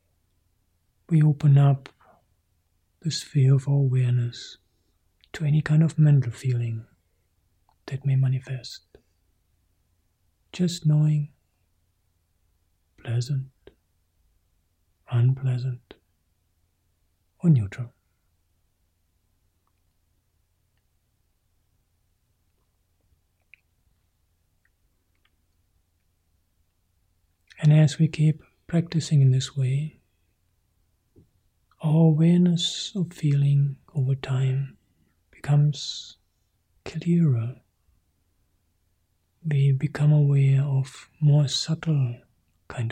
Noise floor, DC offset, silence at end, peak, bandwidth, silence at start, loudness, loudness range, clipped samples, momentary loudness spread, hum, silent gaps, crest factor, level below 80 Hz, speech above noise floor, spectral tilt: -70 dBFS; under 0.1%; 0 s; -10 dBFS; 9.4 kHz; 1.1 s; -23 LUFS; 8 LU; under 0.1%; 18 LU; none; none; 16 dB; -62 dBFS; 48 dB; -7 dB/octave